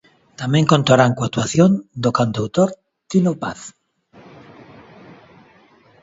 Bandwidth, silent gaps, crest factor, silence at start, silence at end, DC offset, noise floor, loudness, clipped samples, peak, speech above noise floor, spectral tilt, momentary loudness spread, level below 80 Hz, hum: 8 kHz; none; 20 dB; 0.4 s; 2.3 s; under 0.1%; -52 dBFS; -18 LUFS; under 0.1%; 0 dBFS; 35 dB; -6 dB/octave; 14 LU; -54 dBFS; none